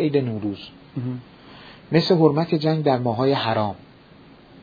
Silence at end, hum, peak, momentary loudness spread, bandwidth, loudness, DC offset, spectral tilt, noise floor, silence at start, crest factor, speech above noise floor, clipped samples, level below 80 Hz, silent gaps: 0.85 s; none; -2 dBFS; 18 LU; 5 kHz; -21 LUFS; under 0.1%; -8.5 dB/octave; -48 dBFS; 0 s; 20 dB; 27 dB; under 0.1%; -60 dBFS; none